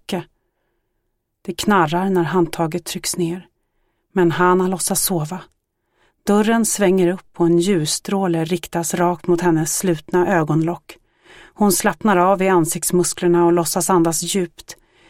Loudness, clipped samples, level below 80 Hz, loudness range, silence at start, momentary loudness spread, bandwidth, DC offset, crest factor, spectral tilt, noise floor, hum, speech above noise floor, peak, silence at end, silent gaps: -18 LUFS; under 0.1%; -50 dBFS; 4 LU; 0.1 s; 9 LU; 16.5 kHz; under 0.1%; 16 dB; -4.5 dB/octave; -72 dBFS; none; 54 dB; -2 dBFS; 0.35 s; none